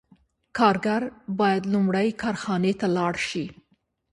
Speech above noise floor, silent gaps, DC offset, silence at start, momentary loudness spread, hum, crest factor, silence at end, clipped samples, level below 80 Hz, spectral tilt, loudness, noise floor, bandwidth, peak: 45 dB; none; under 0.1%; 0.55 s; 9 LU; none; 20 dB; 0.6 s; under 0.1%; -60 dBFS; -6 dB/octave; -24 LUFS; -69 dBFS; 11.5 kHz; -6 dBFS